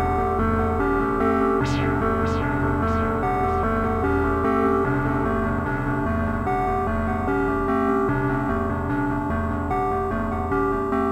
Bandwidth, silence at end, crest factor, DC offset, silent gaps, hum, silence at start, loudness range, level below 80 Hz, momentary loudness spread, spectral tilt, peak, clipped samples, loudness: 15 kHz; 0 s; 14 dB; under 0.1%; none; none; 0 s; 1 LU; -34 dBFS; 4 LU; -8.5 dB/octave; -8 dBFS; under 0.1%; -23 LUFS